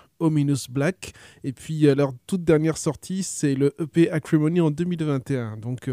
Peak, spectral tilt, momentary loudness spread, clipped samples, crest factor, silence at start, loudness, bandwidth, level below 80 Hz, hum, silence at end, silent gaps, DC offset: -6 dBFS; -6.5 dB/octave; 11 LU; under 0.1%; 16 dB; 0.2 s; -23 LUFS; 15.5 kHz; -58 dBFS; none; 0 s; none; under 0.1%